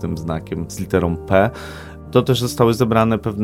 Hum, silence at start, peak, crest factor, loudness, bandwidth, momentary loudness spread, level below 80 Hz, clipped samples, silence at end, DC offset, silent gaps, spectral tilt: none; 0 s; 0 dBFS; 18 dB; -18 LUFS; 16.5 kHz; 11 LU; -40 dBFS; under 0.1%; 0 s; under 0.1%; none; -6.5 dB/octave